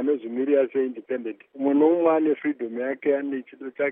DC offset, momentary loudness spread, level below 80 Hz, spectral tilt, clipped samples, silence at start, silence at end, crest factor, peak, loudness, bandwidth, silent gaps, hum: under 0.1%; 12 LU; -88 dBFS; -5 dB/octave; under 0.1%; 0 s; 0 s; 16 dB; -8 dBFS; -24 LUFS; 3.7 kHz; none; none